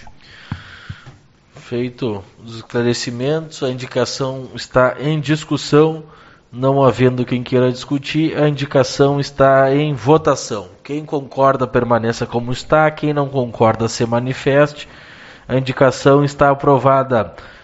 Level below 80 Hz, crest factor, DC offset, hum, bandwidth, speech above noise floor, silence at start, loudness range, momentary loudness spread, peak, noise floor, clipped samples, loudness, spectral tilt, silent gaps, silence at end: -46 dBFS; 16 dB; under 0.1%; none; 8 kHz; 28 dB; 0 s; 6 LU; 15 LU; 0 dBFS; -44 dBFS; under 0.1%; -16 LUFS; -5.5 dB/octave; none; 0.1 s